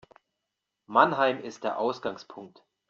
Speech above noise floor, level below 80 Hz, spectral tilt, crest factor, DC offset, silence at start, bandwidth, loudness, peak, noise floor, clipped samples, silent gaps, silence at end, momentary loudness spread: 57 dB; -74 dBFS; -2.5 dB/octave; 24 dB; under 0.1%; 0.9 s; 7.6 kHz; -27 LUFS; -4 dBFS; -85 dBFS; under 0.1%; none; 0.4 s; 21 LU